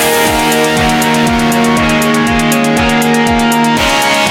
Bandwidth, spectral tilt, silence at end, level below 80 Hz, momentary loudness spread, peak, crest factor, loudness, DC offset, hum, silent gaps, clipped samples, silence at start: 17 kHz; -3.5 dB/octave; 0 s; -28 dBFS; 1 LU; 0 dBFS; 10 dB; -10 LUFS; under 0.1%; none; none; under 0.1%; 0 s